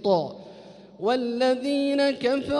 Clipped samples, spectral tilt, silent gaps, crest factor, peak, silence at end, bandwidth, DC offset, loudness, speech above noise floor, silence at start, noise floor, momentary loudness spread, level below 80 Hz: under 0.1%; -5.5 dB/octave; none; 14 dB; -10 dBFS; 0 s; 11 kHz; under 0.1%; -24 LUFS; 23 dB; 0 s; -46 dBFS; 14 LU; -62 dBFS